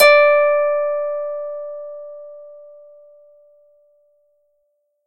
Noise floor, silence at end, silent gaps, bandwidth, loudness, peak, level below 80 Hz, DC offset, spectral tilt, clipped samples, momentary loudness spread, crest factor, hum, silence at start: -68 dBFS; 2.45 s; none; 15 kHz; -17 LUFS; 0 dBFS; -74 dBFS; under 0.1%; 0.5 dB/octave; under 0.1%; 26 LU; 20 dB; none; 0 s